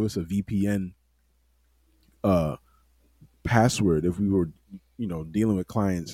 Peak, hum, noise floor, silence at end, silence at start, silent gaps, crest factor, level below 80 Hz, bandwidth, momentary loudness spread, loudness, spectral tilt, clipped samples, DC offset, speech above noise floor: -6 dBFS; none; -67 dBFS; 0 s; 0 s; none; 20 dB; -48 dBFS; 16 kHz; 13 LU; -26 LUFS; -6.5 dB/octave; under 0.1%; under 0.1%; 42 dB